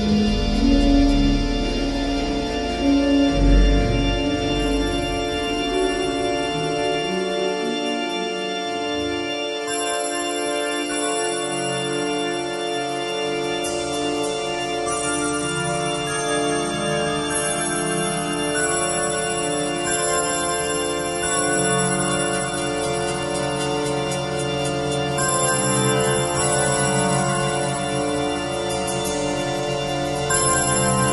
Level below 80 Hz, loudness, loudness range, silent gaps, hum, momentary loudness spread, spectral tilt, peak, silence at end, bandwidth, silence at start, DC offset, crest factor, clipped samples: -30 dBFS; -21 LUFS; 4 LU; none; none; 6 LU; -4 dB/octave; -4 dBFS; 0 s; 11.5 kHz; 0 s; under 0.1%; 16 dB; under 0.1%